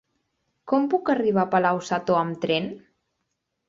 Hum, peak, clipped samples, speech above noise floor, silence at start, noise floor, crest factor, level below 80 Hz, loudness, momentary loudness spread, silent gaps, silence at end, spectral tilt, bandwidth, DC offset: none; -6 dBFS; under 0.1%; 55 dB; 0.65 s; -78 dBFS; 18 dB; -68 dBFS; -23 LUFS; 5 LU; none; 0.9 s; -6 dB/octave; 7.8 kHz; under 0.1%